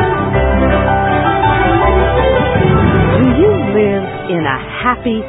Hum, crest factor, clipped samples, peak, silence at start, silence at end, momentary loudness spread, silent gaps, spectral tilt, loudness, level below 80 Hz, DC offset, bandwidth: none; 12 dB; under 0.1%; 0 dBFS; 0 s; 0 s; 5 LU; none; -11 dB/octave; -12 LUFS; -22 dBFS; under 0.1%; 4 kHz